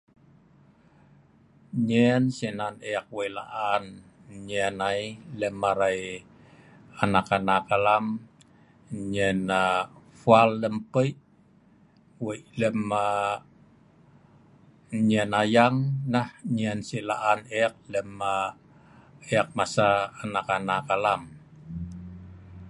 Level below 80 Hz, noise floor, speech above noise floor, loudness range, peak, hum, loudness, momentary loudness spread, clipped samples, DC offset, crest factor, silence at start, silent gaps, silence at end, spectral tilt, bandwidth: -58 dBFS; -59 dBFS; 33 dB; 5 LU; -4 dBFS; none; -26 LUFS; 15 LU; under 0.1%; under 0.1%; 24 dB; 1.75 s; none; 0 s; -6 dB/octave; 11.5 kHz